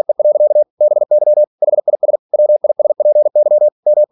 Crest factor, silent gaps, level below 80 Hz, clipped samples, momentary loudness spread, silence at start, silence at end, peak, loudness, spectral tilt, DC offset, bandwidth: 8 dB; 0.70-0.77 s, 1.47-1.58 s, 2.19-2.29 s, 3.72-3.83 s; -80 dBFS; under 0.1%; 4 LU; 0.1 s; 0.05 s; -4 dBFS; -12 LUFS; -11.5 dB/octave; under 0.1%; 1.1 kHz